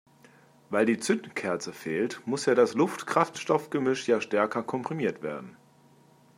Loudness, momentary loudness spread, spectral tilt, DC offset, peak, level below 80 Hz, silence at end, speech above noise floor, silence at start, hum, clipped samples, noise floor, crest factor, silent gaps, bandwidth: -28 LUFS; 9 LU; -5 dB/octave; under 0.1%; -8 dBFS; -78 dBFS; 0.85 s; 31 dB; 0.7 s; none; under 0.1%; -59 dBFS; 22 dB; none; 15.5 kHz